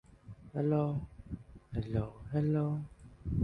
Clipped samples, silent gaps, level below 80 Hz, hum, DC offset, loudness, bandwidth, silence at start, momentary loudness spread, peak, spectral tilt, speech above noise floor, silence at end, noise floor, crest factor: under 0.1%; none; -50 dBFS; none; under 0.1%; -35 LUFS; 4.9 kHz; 0.25 s; 16 LU; -18 dBFS; -10.5 dB/octave; 20 dB; 0 s; -53 dBFS; 16 dB